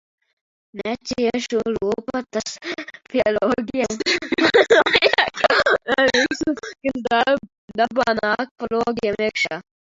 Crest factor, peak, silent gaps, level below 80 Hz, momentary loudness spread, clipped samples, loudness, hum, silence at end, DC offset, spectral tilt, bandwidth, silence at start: 20 dB; 0 dBFS; 7.58-7.68 s, 8.51-8.56 s; -54 dBFS; 12 LU; under 0.1%; -20 LUFS; none; 0.3 s; under 0.1%; -3 dB/octave; 7.8 kHz; 0.75 s